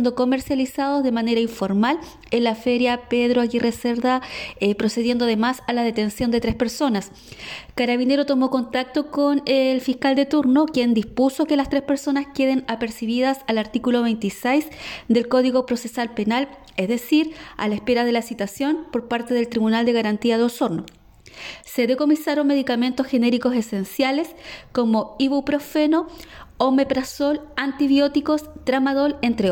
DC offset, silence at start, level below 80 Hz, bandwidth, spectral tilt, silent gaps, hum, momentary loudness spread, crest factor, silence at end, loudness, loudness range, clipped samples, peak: under 0.1%; 0 s; -50 dBFS; 17.5 kHz; -5 dB/octave; none; none; 7 LU; 16 dB; 0 s; -21 LUFS; 3 LU; under 0.1%; -6 dBFS